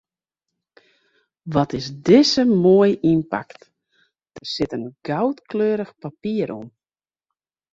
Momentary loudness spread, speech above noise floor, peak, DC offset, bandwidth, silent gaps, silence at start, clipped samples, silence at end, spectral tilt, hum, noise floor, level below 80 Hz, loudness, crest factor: 16 LU; over 71 dB; -2 dBFS; under 0.1%; 7.8 kHz; none; 1.45 s; under 0.1%; 1.05 s; -6 dB/octave; none; under -90 dBFS; -56 dBFS; -20 LUFS; 20 dB